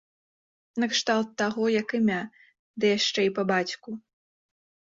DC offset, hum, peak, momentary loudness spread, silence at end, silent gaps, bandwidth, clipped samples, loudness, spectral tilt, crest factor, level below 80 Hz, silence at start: under 0.1%; none; -10 dBFS; 16 LU; 0.95 s; 2.59-2.74 s; 7.8 kHz; under 0.1%; -26 LUFS; -4 dB/octave; 18 dB; -72 dBFS; 0.75 s